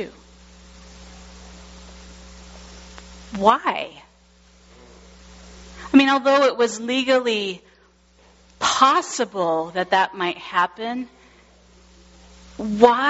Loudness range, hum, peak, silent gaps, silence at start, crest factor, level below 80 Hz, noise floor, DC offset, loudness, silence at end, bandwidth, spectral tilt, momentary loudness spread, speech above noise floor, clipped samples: 6 LU; none; 0 dBFS; none; 0 s; 22 dB; -50 dBFS; -55 dBFS; under 0.1%; -20 LUFS; 0 s; 8 kHz; -2 dB/octave; 26 LU; 36 dB; under 0.1%